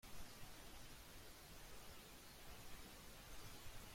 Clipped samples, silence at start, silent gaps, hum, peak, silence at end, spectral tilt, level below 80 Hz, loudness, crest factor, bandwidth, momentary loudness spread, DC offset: under 0.1%; 0.05 s; none; none; -42 dBFS; 0 s; -3 dB/octave; -64 dBFS; -59 LUFS; 14 dB; 16.5 kHz; 2 LU; under 0.1%